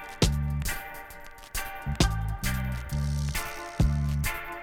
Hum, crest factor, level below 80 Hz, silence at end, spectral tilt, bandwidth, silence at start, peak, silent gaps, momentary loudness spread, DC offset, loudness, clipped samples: none; 22 dB; -32 dBFS; 0 s; -4.5 dB/octave; 18 kHz; 0 s; -8 dBFS; none; 10 LU; under 0.1%; -30 LUFS; under 0.1%